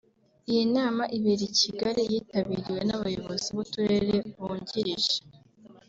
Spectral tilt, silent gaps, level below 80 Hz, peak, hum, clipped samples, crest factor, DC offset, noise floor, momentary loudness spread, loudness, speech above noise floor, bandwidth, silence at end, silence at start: -4.5 dB/octave; none; -60 dBFS; -12 dBFS; none; under 0.1%; 16 dB; under 0.1%; -54 dBFS; 7 LU; -28 LUFS; 27 dB; 7.8 kHz; 0.15 s; 0.5 s